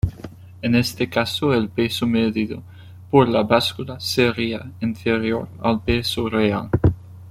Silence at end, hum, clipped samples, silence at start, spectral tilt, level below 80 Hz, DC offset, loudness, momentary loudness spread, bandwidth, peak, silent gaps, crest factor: 0 s; none; under 0.1%; 0.05 s; -6 dB/octave; -40 dBFS; under 0.1%; -21 LUFS; 10 LU; 16 kHz; -2 dBFS; none; 18 dB